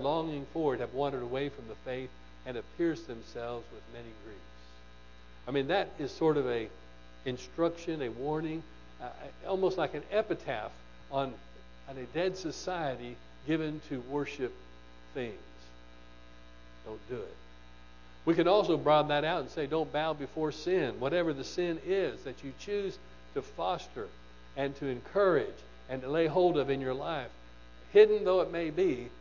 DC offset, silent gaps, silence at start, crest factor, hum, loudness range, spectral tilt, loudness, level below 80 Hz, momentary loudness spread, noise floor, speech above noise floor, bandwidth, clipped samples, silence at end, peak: 0.2%; none; 0 s; 24 dB; 60 Hz at -55 dBFS; 11 LU; -6 dB/octave; -32 LUFS; -56 dBFS; 19 LU; -55 dBFS; 23 dB; 7.4 kHz; under 0.1%; 0 s; -10 dBFS